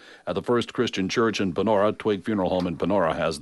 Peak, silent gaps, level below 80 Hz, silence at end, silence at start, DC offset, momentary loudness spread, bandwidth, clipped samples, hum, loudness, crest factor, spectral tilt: -10 dBFS; none; -54 dBFS; 0 s; 0.05 s; under 0.1%; 4 LU; 11.5 kHz; under 0.1%; none; -24 LUFS; 14 dB; -5.5 dB/octave